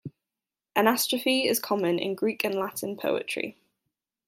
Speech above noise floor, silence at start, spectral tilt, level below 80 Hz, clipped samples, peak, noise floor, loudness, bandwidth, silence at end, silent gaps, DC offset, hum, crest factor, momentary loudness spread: 63 dB; 0.05 s; -3 dB/octave; -76 dBFS; under 0.1%; -6 dBFS; -90 dBFS; -27 LUFS; 16.5 kHz; 0.75 s; none; under 0.1%; none; 22 dB; 9 LU